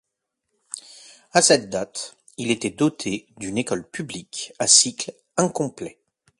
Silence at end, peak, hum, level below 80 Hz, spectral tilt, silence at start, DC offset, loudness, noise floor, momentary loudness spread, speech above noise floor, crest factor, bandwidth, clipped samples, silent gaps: 0.5 s; 0 dBFS; none; -62 dBFS; -2.5 dB/octave; 0.75 s; under 0.1%; -21 LUFS; -80 dBFS; 21 LU; 57 dB; 24 dB; 11.5 kHz; under 0.1%; none